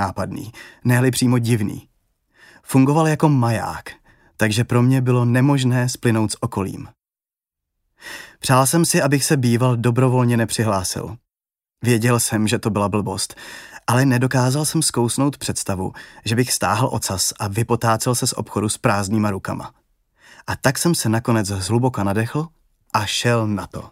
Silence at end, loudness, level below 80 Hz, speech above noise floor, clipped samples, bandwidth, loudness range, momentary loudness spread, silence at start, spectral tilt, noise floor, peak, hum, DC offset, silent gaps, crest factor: 0.05 s; -19 LUFS; -52 dBFS; over 71 dB; under 0.1%; 16 kHz; 3 LU; 12 LU; 0 s; -5 dB/octave; under -90 dBFS; -2 dBFS; none; under 0.1%; none; 18 dB